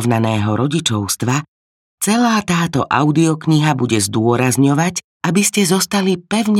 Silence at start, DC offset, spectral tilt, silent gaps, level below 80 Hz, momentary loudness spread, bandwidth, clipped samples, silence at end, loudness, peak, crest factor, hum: 0 s; under 0.1%; -4.5 dB/octave; 1.48-1.98 s, 5.04-5.20 s; -54 dBFS; 4 LU; 16.5 kHz; under 0.1%; 0 s; -16 LUFS; -2 dBFS; 14 dB; none